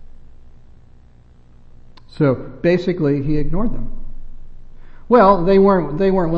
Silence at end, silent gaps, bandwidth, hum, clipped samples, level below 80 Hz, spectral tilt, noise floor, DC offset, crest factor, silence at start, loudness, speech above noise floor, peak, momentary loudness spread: 0 s; none; 5.4 kHz; none; under 0.1%; -28 dBFS; -9.5 dB/octave; -45 dBFS; under 0.1%; 16 dB; 0 s; -16 LUFS; 31 dB; 0 dBFS; 13 LU